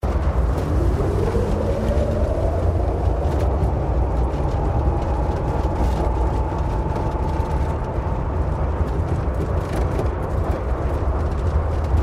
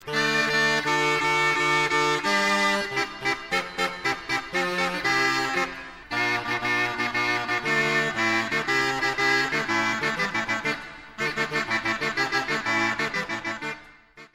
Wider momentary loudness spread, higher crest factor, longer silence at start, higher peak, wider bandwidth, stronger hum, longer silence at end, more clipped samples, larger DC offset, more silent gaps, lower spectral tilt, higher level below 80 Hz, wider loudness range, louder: second, 3 LU vs 7 LU; about the same, 14 dB vs 16 dB; about the same, 0.05 s vs 0 s; first, -6 dBFS vs -10 dBFS; second, 11 kHz vs 16 kHz; neither; about the same, 0 s vs 0.1 s; neither; neither; neither; first, -8.5 dB/octave vs -3 dB/octave; first, -22 dBFS vs -56 dBFS; about the same, 2 LU vs 3 LU; about the same, -22 LUFS vs -24 LUFS